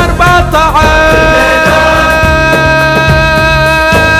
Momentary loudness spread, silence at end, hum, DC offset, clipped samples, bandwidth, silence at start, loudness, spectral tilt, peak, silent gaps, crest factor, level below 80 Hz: 1 LU; 0 s; none; 0.3%; 2%; 16 kHz; 0 s; -6 LUFS; -5 dB/octave; 0 dBFS; none; 6 dB; -16 dBFS